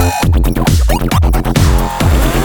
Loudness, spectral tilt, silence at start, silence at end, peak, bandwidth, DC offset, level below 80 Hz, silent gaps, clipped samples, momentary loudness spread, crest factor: -12 LUFS; -5.5 dB/octave; 0 s; 0 s; 0 dBFS; 19.5 kHz; under 0.1%; -14 dBFS; none; under 0.1%; 1 LU; 10 dB